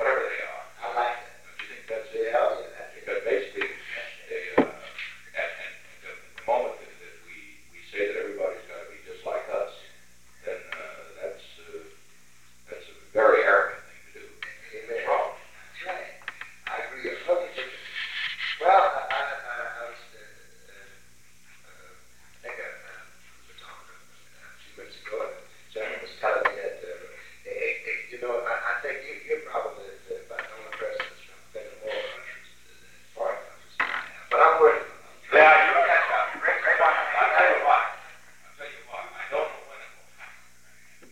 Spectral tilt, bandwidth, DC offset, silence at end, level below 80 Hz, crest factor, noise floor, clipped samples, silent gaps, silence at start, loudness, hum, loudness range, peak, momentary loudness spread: -3 dB/octave; 16.5 kHz; 0.3%; 0.75 s; -68 dBFS; 26 dB; -58 dBFS; under 0.1%; none; 0 s; -26 LUFS; 60 Hz at -65 dBFS; 20 LU; -2 dBFS; 24 LU